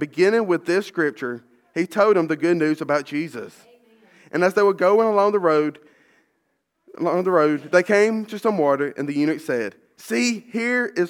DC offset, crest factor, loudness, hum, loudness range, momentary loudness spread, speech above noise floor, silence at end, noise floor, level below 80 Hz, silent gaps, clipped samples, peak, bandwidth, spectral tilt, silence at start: under 0.1%; 18 dB; -21 LUFS; none; 2 LU; 10 LU; 52 dB; 0 s; -72 dBFS; -80 dBFS; none; under 0.1%; -2 dBFS; 16.5 kHz; -5.5 dB/octave; 0 s